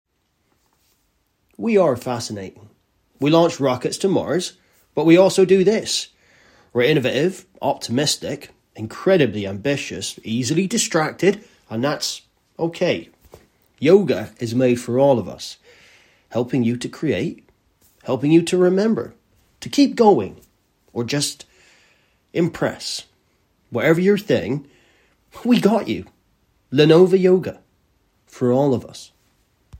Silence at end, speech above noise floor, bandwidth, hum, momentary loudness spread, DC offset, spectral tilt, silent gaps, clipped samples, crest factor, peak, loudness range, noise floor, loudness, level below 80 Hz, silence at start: 0 s; 49 dB; 16 kHz; none; 15 LU; under 0.1%; -5 dB/octave; none; under 0.1%; 20 dB; 0 dBFS; 5 LU; -67 dBFS; -19 LUFS; -60 dBFS; 1.6 s